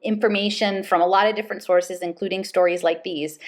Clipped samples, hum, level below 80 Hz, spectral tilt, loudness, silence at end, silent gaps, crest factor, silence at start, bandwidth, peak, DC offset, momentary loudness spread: under 0.1%; none; -76 dBFS; -4.5 dB/octave; -21 LUFS; 0 s; none; 16 dB; 0.05 s; 15 kHz; -4 dBFS; under 0.1%; 10 LU